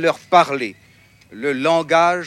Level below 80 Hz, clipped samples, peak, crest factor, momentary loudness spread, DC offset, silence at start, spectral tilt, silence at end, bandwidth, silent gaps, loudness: -66 dBFS; under 0.1%; 0 dBFS; 18 dB; 11 LU; under 0.1%; 0 s; -4.5 dB/octave; 0 s; 12.5 kHz; none; -17 LUFS